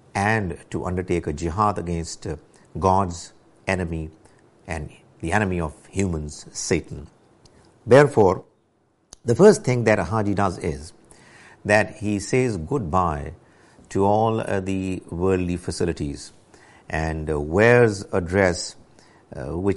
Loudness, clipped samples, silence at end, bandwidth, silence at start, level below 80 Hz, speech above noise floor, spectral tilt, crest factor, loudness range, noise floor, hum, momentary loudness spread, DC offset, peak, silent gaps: -22 LUFS; under 0.1%; 0 s; 11.5 kHz; 0.15 s; -42 dBFS; 43 dB; -6 dB/octave; 20 dB; 8 LU; -64 dBFS; none; 18 LU; under 0.1%; -2 dBFS; none